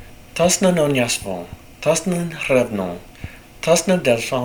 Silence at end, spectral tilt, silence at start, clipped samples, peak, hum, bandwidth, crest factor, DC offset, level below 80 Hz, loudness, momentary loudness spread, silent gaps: 0 s; -4 dB/octave; 0 s; under 0.1%; -2 dBFS; none; over 20 kHz; 18 dB; under 0.1%; -46 dBFS; -19 LUFS; 18 LU; none